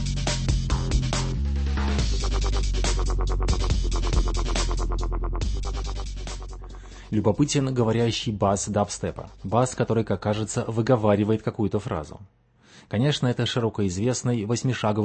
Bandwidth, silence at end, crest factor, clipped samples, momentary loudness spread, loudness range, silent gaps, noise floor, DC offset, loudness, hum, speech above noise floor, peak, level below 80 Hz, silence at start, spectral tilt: 8.8 kHz; 0 s; 18 dB; under 0.1%; 10 LU; 3 LU; none; -53 dBFS; under 0.1%; -25 LUFS; none; 29 dB; -6 dBFS; -28 dBFS; 0 s; -5.5 dB/octave